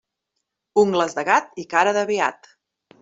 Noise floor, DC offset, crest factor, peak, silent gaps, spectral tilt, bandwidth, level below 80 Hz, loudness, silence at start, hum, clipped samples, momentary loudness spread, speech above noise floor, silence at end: -79 dBFS; under 0.1%; 20 dB; -4 dBFS; none; -4 dB/octave; 7.8 kHz; -68 dBFS; -20 LUFS; 0.75 s; none; under 0.1%; 5 LU; 59 dB; 0.7 s